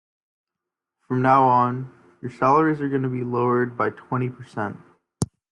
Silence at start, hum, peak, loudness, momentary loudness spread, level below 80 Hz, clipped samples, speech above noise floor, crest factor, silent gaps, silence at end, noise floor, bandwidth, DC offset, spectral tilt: 1.1 s; none; -4 dBFS; -22 LUFS; 14 LU; -62 dBFS; under 0.1%; 65 dB; 18 dB; none; 0.25 s; -86 dBFS; 12 kHz; under 0.1%; -7.5 dB/octave